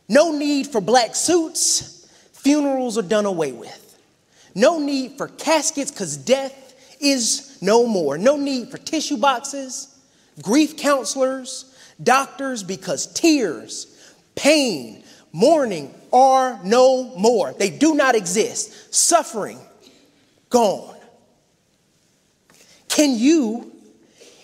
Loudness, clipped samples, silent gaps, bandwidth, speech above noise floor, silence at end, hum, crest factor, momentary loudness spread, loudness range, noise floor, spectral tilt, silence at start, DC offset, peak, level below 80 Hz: -19 LUFS; under 0.1%; none; 16 kHz; 44 dB; 0.75 s; none; 20 dB; 15 LU; 5 LU; -62 dBFS; -3 dB/octave; 0.1 s; under 0.1%; 0 dBFS; -68 dBFS